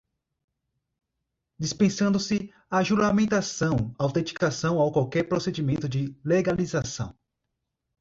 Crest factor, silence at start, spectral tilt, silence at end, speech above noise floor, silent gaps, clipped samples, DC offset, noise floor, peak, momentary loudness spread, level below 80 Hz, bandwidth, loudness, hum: 16 dB; 1.6 s; -5.5 dB/octave; 0.9 s; 57 dB; none; under 0.1%; under 0.1%; -82 dBFS; -10 dBFS; 8 LU; -54 dBFS; 7.8 kHz; -26 LUFS; none